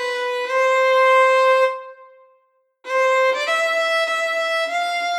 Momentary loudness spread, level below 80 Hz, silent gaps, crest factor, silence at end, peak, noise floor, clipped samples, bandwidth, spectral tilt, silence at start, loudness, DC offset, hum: 8 LU; under -90 dBFS; none; 12 dB; 0 s; -6 dBFS; -63 dBFS; under 0.1%; 13.5 kHz; 3 dB/octave; 0 s; -18 LUFS; under 0.1%; none